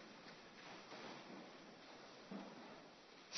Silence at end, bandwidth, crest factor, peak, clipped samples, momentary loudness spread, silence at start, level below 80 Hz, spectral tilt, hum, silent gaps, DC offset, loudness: 0 s; 6.2 kHz; 22 dB; -34 dBFS; under 0.1%; 5 LU; 0 s; -88 dBFS; -2.5 dB/octave; none; none; under 0.1%; -57 LUFS